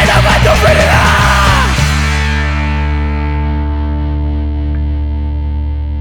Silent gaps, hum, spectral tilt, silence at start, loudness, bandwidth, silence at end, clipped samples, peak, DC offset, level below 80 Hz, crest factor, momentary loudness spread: none; none; -5 dB/octave; 0 s; -12 LUFS; 18 kHz; 0 s; under 0.1%; 0 dBFS; under 0.1%; -14 dBFS; 10 dB; 9 LU